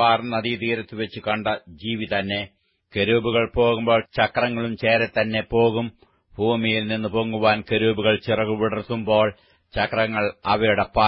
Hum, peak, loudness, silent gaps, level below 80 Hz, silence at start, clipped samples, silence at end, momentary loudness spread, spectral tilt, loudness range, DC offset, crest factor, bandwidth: none; -4 dBFS; -22 LUFS; none; -48 dBFS; 0 s; under 0.1%; 0 s; 8 LU; -10.5 dB/octave; 3 LU; under 0.1%; 18 dB; 5.8 kHz